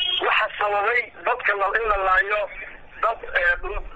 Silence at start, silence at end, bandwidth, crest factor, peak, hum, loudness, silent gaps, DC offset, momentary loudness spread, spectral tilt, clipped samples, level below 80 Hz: 0 s; 0 s; 8 kHz; 16 dB; -8 dBFS; none; -21 LUFS; none; under 0.1%; 7 LU; 1.5 dB/octave; under 0.1%; -40 dBFS